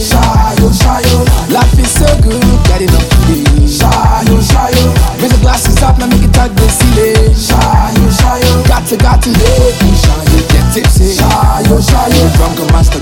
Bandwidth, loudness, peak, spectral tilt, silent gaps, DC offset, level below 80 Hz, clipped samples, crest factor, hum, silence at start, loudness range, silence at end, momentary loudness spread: 17.5 kHz; -8 LUFS; 0 dBFS; -5 dB/octave; none; under 0.1%; -10 dBFS; 0.5%; 6 dB; none; 0 s; 0 LU; 0 s; 2 LU